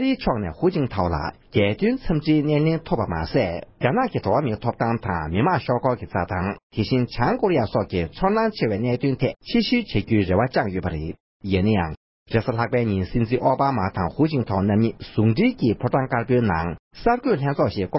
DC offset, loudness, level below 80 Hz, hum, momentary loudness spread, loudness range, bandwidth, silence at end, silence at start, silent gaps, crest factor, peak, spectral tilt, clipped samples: under 0.1%; -22 LUFS; -40 dBFS; none; 6 LU; 2 LU; 5.8 kHz; 0 s; 0 s; 6.63-6.70 s, 11.20-11.40 s, 11.97-12.26 s, 16.79-16.91 s; 14 dB; -6 dBFS; -11.5 dB/octave; under 0.1%